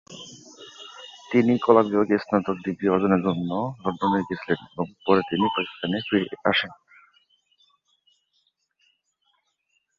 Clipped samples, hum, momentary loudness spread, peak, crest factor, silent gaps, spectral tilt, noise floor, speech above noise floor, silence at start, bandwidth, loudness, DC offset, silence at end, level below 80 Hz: under 0.1%; none; 22 LU; -2 dBFS; 22 dB; none; -6.5 dB/octave; -73 dBFS; 50 dB; 0.1 s; 7.4 kHz; -23 LUFS; under 0.1%; 3.25 s; -60 dBFS